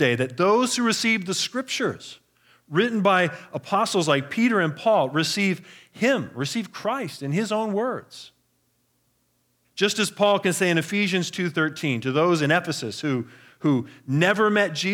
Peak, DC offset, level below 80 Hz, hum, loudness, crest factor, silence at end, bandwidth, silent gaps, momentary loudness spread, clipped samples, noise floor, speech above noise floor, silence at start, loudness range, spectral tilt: -6 dBFS; under 0.1%; -76 dBFS; 60 Hz at -50 dBFS; -23 LUFS; 18 dB; 0 s; 19 kHz; none; 9 LU; under 0.1%; -69 dBFS; 46 dB; 0 s; 5 LU; -4.5 dB/octave